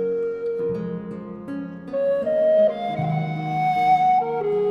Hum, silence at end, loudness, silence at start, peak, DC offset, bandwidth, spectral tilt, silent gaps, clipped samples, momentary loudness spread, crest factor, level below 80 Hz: none; 0 s; -22 LUFS; 0 s; -10 dBFS; under 0.1%; 7 kHz; -8.5 dB/octave; none; under 0.1%; 14 LU; 12 dB; -62 dBFS